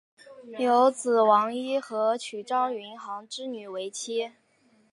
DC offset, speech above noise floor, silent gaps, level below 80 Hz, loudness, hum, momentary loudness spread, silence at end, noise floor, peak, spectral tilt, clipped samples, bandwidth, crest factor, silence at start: under 0.1%; 38 dB; none; -86 dBFS; -26 LUFS; none; 15 LU; 0.65 s; -64 dBFS; -8 dBFS; -3 dB/octave; under 0.1%; 11.5 kHz; 18 dB; 0.25 s